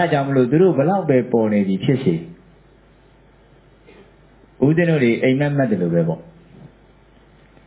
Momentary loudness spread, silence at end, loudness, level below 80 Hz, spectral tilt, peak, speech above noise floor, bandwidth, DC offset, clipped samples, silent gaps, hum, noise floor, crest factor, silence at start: 7 LU; 1.45 s; -18 LUFS; -54 dBFS; -12 dB/octave; -4 dBFS; 34 dB; 4 kHz; under 0.1%; under 0.1%; none; none; -50 dBFS; 16 dB; 0 s